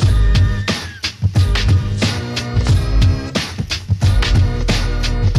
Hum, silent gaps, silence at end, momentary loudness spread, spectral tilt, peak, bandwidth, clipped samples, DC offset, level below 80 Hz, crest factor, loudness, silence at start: none; none; 0 s; 7 LU; -5.5 dB/octave; -6 dBFS; 12 kHz; under 0.1%; under 0.1%; -20 dBFS; 10 dB; -17 LUFS; 0 s